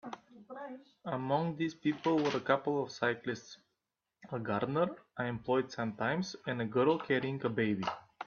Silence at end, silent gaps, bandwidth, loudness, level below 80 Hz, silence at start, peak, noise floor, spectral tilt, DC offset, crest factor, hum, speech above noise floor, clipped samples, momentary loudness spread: 0 s; none; 7 kHz; -34 LUFS; -72 dBFS; 0.05 s; -14 dBFS; -87 dBFS; -6.5 dB/octave; under 0.1%; 20 dB; none; 54 dB; under 0.1%; 15 LU